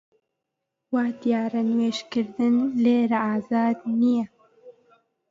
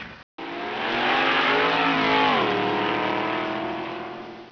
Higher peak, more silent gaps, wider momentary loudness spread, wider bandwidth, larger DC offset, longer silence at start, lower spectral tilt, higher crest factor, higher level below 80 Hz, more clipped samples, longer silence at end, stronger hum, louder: about the same, -10 dBFS vs -8 dBFS; second, none vs 0.23-0.38 s; second, 6 LU vs 15 LU; first, 7.4 kHz vs 5.4 kHz; neither; first, 0.9 s vs 0 s; first, -6.5 dB/octave vs -5 dB/octave; about the same, 14 dB vs 16 dB; second, -72 dBFS vs -58 dBFS; neither; first, 0.6 s vs 0 s; neither; about the same, -23 LUFS vs -22 LUFS